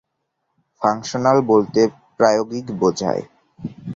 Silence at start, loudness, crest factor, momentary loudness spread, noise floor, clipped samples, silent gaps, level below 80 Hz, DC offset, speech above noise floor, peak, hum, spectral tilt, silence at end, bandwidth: 0.8 s; -19 LUFS; 18 dB; 13 LU; -74 dBFS; under 0.1%; none; -58 dBFS; under 0.1%; 57 dB; -2 dBFS; none; -5.5 dB/octave; 0 s; 7.6 kHz